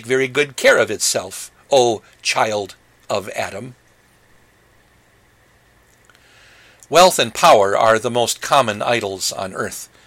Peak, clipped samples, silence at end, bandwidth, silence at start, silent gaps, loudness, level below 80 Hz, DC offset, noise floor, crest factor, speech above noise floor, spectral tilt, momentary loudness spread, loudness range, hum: -2 dBFS; under 0.1%; 0.2 s; 16.5 kHz; 0 s; none; -17 LUFS; -56 dBFS; under 0.1%; -54 dBFS; 18 dB; 37 dB; -2.5 dB/octave; 14 LU; 16 LU; none